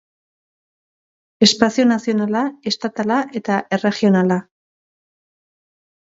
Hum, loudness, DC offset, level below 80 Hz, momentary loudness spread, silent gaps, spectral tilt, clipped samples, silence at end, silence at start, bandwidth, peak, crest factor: none; -18 LUFS; under 0.1%; -62 dBFS; 7 LU; none; -4.5 dB/octave; under 0.1%; 1.6 s; 1.4 s; 7.8 kHz; 0 dBFS; 20 dB